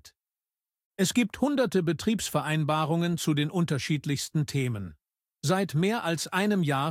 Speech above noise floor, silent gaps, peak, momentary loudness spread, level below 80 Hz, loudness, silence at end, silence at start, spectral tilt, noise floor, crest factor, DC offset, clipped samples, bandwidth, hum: over 63 dB; 0.85-0.91 s; -12 dBFS; 4 LU; -62 dBFS; -27 LUFS; 0 s; 0.05 s; -5.5 dB/octave; under -90 dBFS; 16 dB; under 0.1%; under 0.1%; 16.5 kHz; none